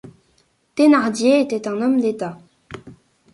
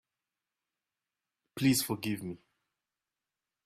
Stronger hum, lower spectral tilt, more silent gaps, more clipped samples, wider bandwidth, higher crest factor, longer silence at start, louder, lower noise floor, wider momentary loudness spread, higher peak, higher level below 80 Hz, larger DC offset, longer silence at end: neither; about the same, -5 dB/octave vs -4 dB/octave; neither; neither; second, 11.5 kHz vs 16 kHz; second, 16 dB vs 22 dB; second, 0.05 s vs 1.55 s; first, -18 LUFS vs -31 LUFS; second, -62 dBFS vs under -90 dBFS; first, 24 LU vs 20 LU; first, -4 dBFS vs -16 dBFS; first, -62 dBFS vs -70 dBFS; neither; second, 0.4 s vs 1.3 s